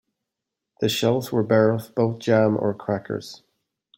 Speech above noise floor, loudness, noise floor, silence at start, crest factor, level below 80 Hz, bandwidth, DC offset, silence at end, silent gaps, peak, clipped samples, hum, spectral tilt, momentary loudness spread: 63 dB; -22 LUFS; -84 dBFS; 0.8 s; 18 dB; -64 dBFS; 16.5 kHz; under 0.1%; 0.6 s; none; -6 dBFS; under 0.1%; none; -6 dB/octave; 10 LU